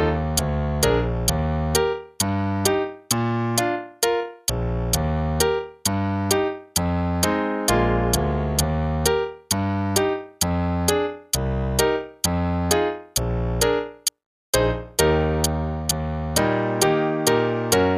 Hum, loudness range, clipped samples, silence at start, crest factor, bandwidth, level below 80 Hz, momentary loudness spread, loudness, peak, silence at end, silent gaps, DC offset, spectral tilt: none; 1 LU; under 0.1%; 0 s; 20 dB; 15.5 kHz; -32 dBFS; 5 LU; -22 LUFS; -4 dBFS; 0 s; 14.26-14.53 s; under 0.1%; -4.5 dB/octave